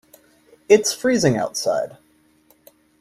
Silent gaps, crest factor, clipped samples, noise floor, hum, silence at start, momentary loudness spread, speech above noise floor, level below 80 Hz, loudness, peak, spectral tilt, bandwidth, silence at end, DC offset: none; 20 dB; under 0.1%; -58 dBFS; none; 0.7 s; 8 LU; 39 dB; -58 dBFS; -19 LUFS; -2 dBFS; -4 dB/octave; 15 kHz; 1.1 s; under 0.1%